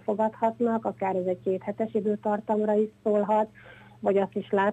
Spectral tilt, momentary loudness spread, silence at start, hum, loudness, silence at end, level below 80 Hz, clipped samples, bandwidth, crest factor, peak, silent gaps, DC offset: -8.5 dB/octave; 5 LU; 0.05 s; none; -27 LUFS; 0 s; -70 dBFS; under 0.1%; 8.8 kHz; 16 dB; -12 dBFS; none; under 0.1%